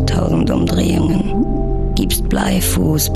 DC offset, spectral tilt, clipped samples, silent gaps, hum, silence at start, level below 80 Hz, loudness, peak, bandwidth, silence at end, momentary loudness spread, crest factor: under 0.1%; -5.5 dB/octave; under 0.1%; none; none; 0 s; -22 dBFS; -16 LUFS; -2 dBFS; 14 kHz; 0 s; 4 LU; 14 dB